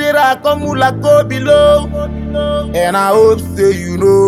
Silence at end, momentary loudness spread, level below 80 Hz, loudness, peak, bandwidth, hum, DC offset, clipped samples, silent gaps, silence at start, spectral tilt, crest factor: 0 s; 8 LU; -30 dBFS; -12 LUFS; 0 dBFS; 15.5 kHz; none; under 0.1%; under 0.1%; none; 0 s; -5.5 dB/octave; 10 dB